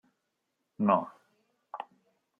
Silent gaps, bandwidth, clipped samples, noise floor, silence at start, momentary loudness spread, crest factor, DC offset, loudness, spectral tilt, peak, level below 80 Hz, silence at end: none; 3.6 kHz; under 0.1%; -82 dBFS; 0.8 s; 20 LU; 26 dB; under 0.1%; -29 LUFS; -9.5 dB/octave; -10 dBFS; -84 dBFS; 0.55 s